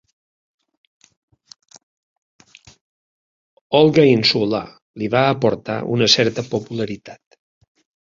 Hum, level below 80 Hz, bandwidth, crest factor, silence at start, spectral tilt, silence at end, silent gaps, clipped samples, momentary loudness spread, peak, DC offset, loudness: none; -58 dBFS; 7.6 kHz; 20 dB; 3.7 s; -5 dB/octave; 0.95 s; 4.82-4.94 s; under 0.1%; 14 LU; 0 dBFS; under 0.1%; -17 LUFS